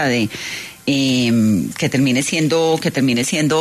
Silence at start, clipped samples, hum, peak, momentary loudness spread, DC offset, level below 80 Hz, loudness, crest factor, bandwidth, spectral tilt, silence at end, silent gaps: 0 s; under 0.1%; none; -6 dBFS; 7 LU; under 0.1%; -52 dBFS; -17 LUFS; 12 dB; 13.5 kHz; -4.5 dB/octave; 0 s; none